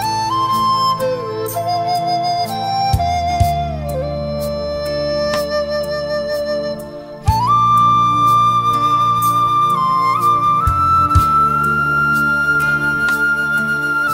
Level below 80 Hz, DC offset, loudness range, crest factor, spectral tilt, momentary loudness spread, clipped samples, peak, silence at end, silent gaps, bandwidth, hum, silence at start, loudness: -32 dBFS; under 0.1%; 6 LU; 16 dB; -5 dB/octave; 9 LU; under 0.1%; 0 dBFS; 0 s; none; 16.5 kHz; none; 0 s; -15 LUFS